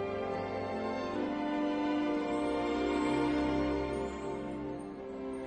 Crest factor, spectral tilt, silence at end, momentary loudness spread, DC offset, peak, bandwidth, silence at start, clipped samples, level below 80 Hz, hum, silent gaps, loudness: 14 dB; -6.5 dB/octave; 0 s; 9 LU; under 0.1%; -20 dBFS; 9.4 kHz; 0 s; under 0.1%; -52 dBFS; none; none; -34 LUFS